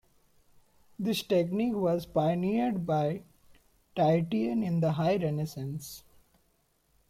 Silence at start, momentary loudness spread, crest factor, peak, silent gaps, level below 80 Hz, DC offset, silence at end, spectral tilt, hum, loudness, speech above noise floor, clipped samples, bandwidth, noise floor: 1 s; 12 LU; 16 dB; -14 dBFS; none; -62 dBFS; under 0.1%; 1.1 s; -7 dB/octave; none; -30 LUFS; 42 dB; under 0.1%; 16 kHz; -71 dBFS